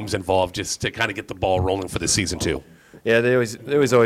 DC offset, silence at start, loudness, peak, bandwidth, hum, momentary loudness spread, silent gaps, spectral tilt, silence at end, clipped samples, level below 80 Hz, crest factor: under 0.1%; 0 s; -22 LUFS; -4 dBFS; 16 kHz; none; 8 LU; none; -4 dB/octave; 0 s; under 0.1%; -44 dBFS; 16 dB